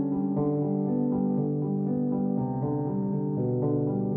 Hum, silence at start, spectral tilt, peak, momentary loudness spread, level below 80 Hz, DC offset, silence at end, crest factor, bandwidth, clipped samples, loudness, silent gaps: none; 0 s; -15 dB/octave; -16 dBFS; 2 LU; -58 dBFS; under 0.1%; 0 s; 10 dB; 2.1 kHz; under 0.1%; -28 LUFS; none